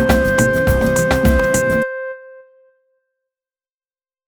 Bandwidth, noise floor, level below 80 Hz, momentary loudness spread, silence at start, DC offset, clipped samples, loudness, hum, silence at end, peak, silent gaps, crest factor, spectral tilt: over 20 kHz; under -90 dBFS; -26 dBFS; 13 LU; 0 s; under 0.1%; under 0.1%; -15 LUFS; none; 1.85 s; 0 dBFS; none; 18 dB; -5.5 dB/octave